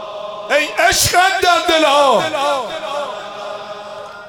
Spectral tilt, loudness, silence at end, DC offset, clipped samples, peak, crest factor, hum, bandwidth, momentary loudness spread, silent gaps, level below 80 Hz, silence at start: -2 dB/octave; -14 LUFS; 0 s; under 0.1%; under 0.1%; 0 dBFS; 16 dB; none; 17.5 kHz; 16 LU; none; -44 dBFS; 0 s